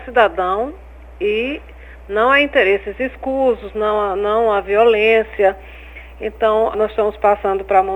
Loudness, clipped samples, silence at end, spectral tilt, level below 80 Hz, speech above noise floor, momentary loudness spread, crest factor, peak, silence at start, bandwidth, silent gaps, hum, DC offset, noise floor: -16 LUFS; under 0.1%; 0 s; -6 dB/octave; -40 dBFS; 20 dB; 14 LU; 16 dB; 0 dBFS; 0 s; 19 kHz; none; none; 0.1%; -36 dBFS